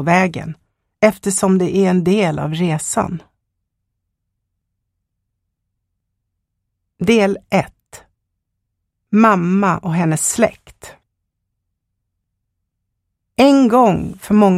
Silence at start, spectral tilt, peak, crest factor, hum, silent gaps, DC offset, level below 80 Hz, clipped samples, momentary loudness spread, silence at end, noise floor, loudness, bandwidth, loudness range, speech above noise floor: 0 s; -5.5 dB/octave; 0 dBFS; 18 dB; none; none; under 0.1%; -50 dBFS; under 0.1%; 10 LU; 0 s; -75 dBFS; -15 LUFS; 15 kHz; 7 LU; 60 dB